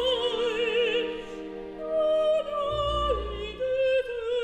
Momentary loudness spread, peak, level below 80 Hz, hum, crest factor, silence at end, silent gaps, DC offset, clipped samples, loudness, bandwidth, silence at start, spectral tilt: 12 LU; -14 dBFS; -44 dBFS; none; 12 dB; 0 s; none; under 0.1%; under 0.1%; -27 LUFS; 9.4 kHz; 0 s; -4.5 dB/octave